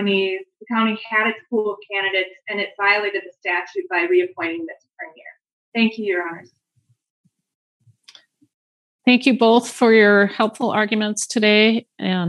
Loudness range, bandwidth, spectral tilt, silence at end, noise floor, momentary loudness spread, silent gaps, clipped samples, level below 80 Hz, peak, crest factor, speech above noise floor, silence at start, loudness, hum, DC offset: 11 LU; 12 kHz; -4 dB/octave; 0 s; -65 dBFS; 13 LU; 5.53-5.72 s, 7.10-7.24 s, 7.55-7.80 s, 8.54-8.99 s; under 0.1%; -86 dBFS; -2 dBFS; 18 dB; 46 dB; 0 s; -18 LUFS; none; under 0.1%